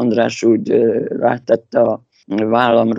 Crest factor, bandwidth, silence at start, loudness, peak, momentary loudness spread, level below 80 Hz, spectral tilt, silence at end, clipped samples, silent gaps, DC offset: 14 dB; 7.8 kHz; 0 s; -16 LUFS; 0 dBFS; 6 LU; -62 dBFS; -6.5 dB/octave; 0 s; under 0.1%; none; under 0.1%